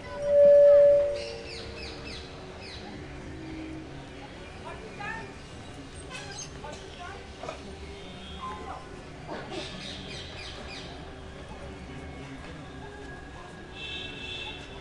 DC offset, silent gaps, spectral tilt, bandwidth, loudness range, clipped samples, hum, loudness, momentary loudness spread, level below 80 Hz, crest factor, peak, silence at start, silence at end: under 0.1%; none; -5 dB/octave; 10.5 kHz; 15 LU; under 0.1%; none; -27 LUFS; 21 LU; -50 dBFS; 18 dB; -12 dBFS; 0 s; 0 s